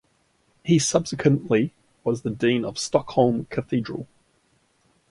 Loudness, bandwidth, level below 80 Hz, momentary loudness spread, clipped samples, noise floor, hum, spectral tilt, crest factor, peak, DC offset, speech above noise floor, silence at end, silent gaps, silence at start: -23 LUFS; 11.5 kHz; -58 dBFS; 12 LU; under 0.1%; -66 dBFS; none; -5.5 dB/octave; 22 dB; -4 dBFS; under 0.1%; 43 dB; 1.05 s; none; 0.65 s